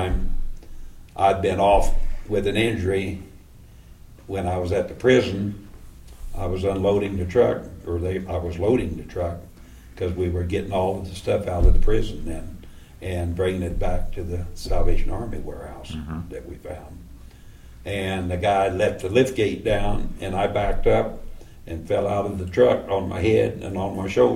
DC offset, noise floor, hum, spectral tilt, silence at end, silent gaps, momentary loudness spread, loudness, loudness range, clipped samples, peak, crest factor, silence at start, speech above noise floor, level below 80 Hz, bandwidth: under 0.1%; -46 dBFS; none; -6.5 dB/octave; 0 s; none; 17 LU; -24 LUFS; 6 LU; under 0.1%; -4 dBFS; 18 dB; 0 s; 24 dB; -28 dBFS; 12.5 kHz